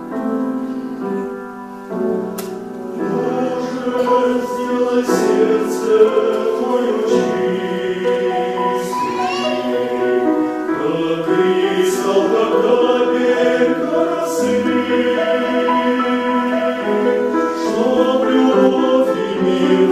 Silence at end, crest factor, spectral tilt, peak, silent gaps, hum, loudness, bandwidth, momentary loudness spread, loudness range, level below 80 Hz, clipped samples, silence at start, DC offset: 0 s; 16 dB; -5.5 dB/octave; -2 dBFS; none; none; -17 LUFS; 15 kHz; 8 LU; 5 LU; -58 dBFS; under 0.1%; 0 s; under 0.1%